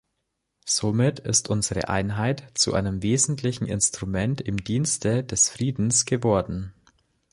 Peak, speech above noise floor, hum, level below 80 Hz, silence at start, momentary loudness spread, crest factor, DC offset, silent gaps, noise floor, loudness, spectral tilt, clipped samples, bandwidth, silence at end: -6 dBFS; 54 dB; none; -46 dBFS; 0.65 s; 6 LU; 18 dB; under 0.1%; none; -78 dBFS; -23 LUFS; -4 dB/octave; under 0.1%; 11.5 kHz; 0.6 s